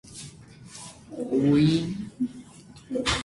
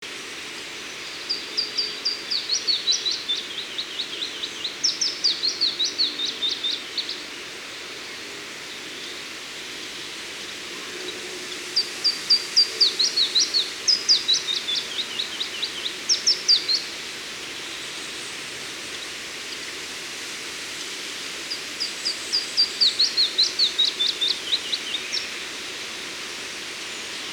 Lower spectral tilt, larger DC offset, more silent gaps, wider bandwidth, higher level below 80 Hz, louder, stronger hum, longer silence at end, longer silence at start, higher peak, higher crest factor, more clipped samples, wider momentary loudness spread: first, -5.5 dB/octave vs 1 dB/octave; neither; neither; second, 11.5 kHz vs over 20 kHz; first, -50 dBFS vs -66 dBFS; second, -26 LUFS vs -23 LUFS; neither; about the same, 0 s vs 0 s; about the same, 0.05 s vs 0 s; second, -10 dBFS vs -6 dBFS; about the same, 16 dB vs 20 dB; neither; first, 23 LU vs 15 LU